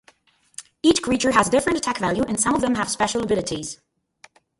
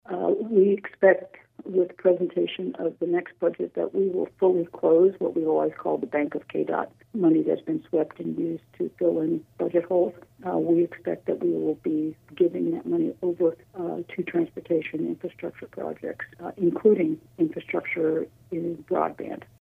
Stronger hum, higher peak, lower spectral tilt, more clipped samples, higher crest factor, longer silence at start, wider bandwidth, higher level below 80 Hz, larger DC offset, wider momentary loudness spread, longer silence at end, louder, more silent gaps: neither; about the same, -4 dBFS vs -6 dBFS; second, -3.5 dB/octave vs -9 dB/octave; neither; about the same, 18 dB vs 20 dB; first, 0.6 s vs 0.1 s; first, 11.5 kHz vs 3.7 kHz; first, -50 dBFS vs -70 dBFS; neither; first, 19 LU vs 12 LU; first, 0.85 s vs 0.25 s; first, -21 LUFS vs -26 LUFS; neither